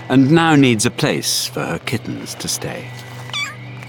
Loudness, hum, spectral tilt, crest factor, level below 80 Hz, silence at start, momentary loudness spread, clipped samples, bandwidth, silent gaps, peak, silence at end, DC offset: -17 LUFS; none; -4.5 dB/octave; 16 dB; -54 dBFS; 0 s; 16 LU; under 0.1%; 19 kHz; none; -2 dBFS; 0 s; under 0.1%